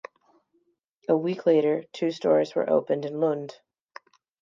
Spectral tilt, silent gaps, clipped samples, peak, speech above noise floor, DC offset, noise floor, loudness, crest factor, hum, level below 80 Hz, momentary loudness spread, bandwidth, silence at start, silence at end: -7 dB/octave; none; under 0.1%; -8 dBFS; 47 dB; under 0.1%; -71 dBFS; -25 LUFS; 18 dB; none; -82 dBFS; 9 LU; 7.4 kHz; 1.1 s; 0.9 s